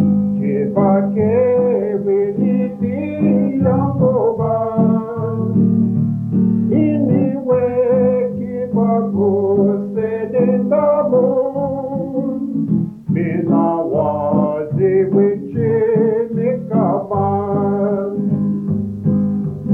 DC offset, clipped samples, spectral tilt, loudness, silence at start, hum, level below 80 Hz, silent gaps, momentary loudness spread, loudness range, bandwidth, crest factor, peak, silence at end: under 0.1%; under 0.1%; -12.5 dB/octave; -16 LUFS; 0 s; none; -54 dBFS; none; 6 LU; 2 LU; 3 kHz; 14 dB; -2 dBFS; 0 s